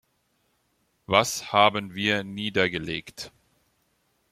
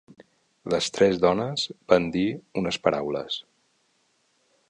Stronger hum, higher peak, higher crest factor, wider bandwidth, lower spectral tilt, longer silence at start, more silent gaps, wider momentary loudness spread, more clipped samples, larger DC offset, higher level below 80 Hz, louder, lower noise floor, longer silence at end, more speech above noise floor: neither; about the same, -4 dBFS vs -4 dBFS; about the same, 24 dB vs 24 dB; first, 16 kHz vs 10.5 kHz; second, -3.5 dB/octave vs -5 dB/octave; first, 1.1 s vs 0.65 s; neither; first, 17 LU vs 9 LU; neither; neither; about the same, -62 dBFS vs -58 dBFS; about the same, -24 LUFS vs -25 LUFS; about the same, -71 dBFS vs -68 dBFS; second, 1.05 s vs 1.3 s; about the same, 46 dB vs 44 dB